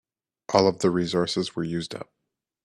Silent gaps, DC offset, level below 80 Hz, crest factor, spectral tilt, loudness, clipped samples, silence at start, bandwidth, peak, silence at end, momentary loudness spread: none; under 0.1%; -62 dBFS; 22 dB; -5.5 dB/octave; -24 LUFS; under 0.1%; 0.5 s; 12 kHz; -4 dBFS; 0.6 s; 15 LU